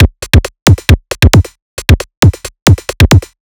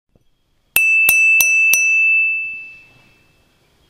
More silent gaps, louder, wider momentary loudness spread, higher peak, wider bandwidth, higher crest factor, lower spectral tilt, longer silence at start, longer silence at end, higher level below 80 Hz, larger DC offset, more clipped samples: first, 0.62-0.66 s, 1.62-1.77 s, 2.17-2.22 s, 2.62-2.66 s vs none; about the same, -9 LUFS vs -11 LUFS; second, 4 LU vs 11 LU; about the same, 0 dBFS vs 0 dBFS; first, over 20 kHz vs 16 kHz; second, 8 dB vs 16 dB; first, -5 dB/octave vs 2 dB/octave; second, 0 s vs 0.75 s; second, 0.35 s vs 1.15 s; first, -16 dBFS vs -60 dBFS; neither; first, 10% vs under 0.1%